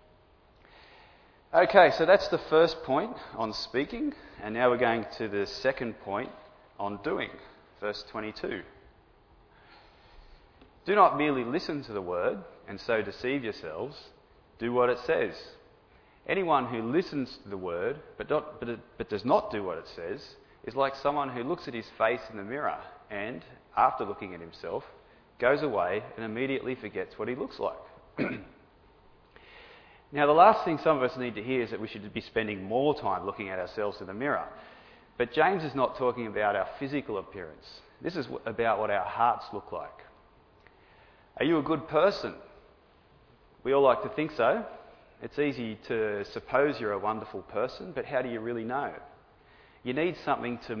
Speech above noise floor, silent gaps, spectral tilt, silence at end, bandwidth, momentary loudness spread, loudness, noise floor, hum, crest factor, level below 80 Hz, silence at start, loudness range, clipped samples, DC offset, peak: 31 dB; none; -6.5 dB/octave; 0 s; 5.4 kHz; 15 LU; -29 LUFS; -60 dBFS; none; 26 dB; -62 dBFS; 1.55 s; 8 LU; under 0.1%; under 0.1%; -4 dBFS